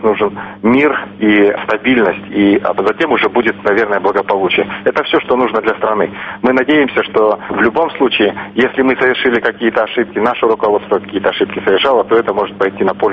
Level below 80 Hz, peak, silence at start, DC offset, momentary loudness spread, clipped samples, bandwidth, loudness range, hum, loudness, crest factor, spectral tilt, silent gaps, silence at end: -50 dBFS; 0 dBFS; 0 s; under 0.1%; 4 LU; under 0.1%; 6.4 kHz; 1 LU; none; -13 LUFS; 12 dB; -7 dB/octave; none; 0 s